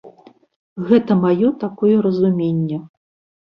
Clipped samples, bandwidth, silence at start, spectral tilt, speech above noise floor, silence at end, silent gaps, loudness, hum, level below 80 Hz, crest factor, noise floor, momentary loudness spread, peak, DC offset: under 0.1%; 5.6 kHz; 0.05 s; -10.5 dB/octave; 30 dB; 0.6 s; 0.56-0.76 s; -17 LUFS; none; -58 dBFS; 16 dB; -47 dBFS; 13 LU; -2 dBFS; under 0.1%